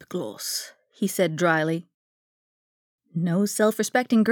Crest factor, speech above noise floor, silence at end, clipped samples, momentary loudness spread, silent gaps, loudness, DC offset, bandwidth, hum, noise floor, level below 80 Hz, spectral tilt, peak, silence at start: 18 dB; over 67 dB; 0 s; under 0.1%; 11 LU; 1.94-2.99 s; -25 LUFS; under 0.1%; over 20 kHz; none; under -90 dBFS; -82 dBFS; -5 dB/octave; -6 dBFS; 0.1 s